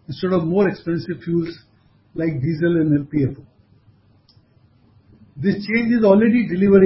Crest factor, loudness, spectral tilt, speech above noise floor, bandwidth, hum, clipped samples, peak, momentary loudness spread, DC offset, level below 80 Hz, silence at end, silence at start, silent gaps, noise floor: 18 dB; -19 LUFS; -12.5 dB/octave; 37 dB; 5.8 kHz; none; under 0.1%; -2 dBFS; 11 LU; under 0.1%; -50 dBFS; 0 s; 0.1 s; none; -55 dBFS